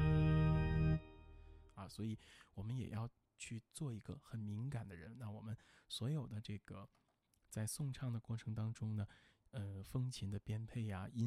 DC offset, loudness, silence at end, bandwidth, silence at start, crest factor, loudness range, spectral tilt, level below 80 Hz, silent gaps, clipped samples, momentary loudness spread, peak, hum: under 0.1%; -44 LUFS; 0 s; 14.5 kHz; 0 s; 18 dB; 6 LU; -6.5 dB/octave; -54 dBFS; none; under 0.1%; 18 LU; -24 dBFS; none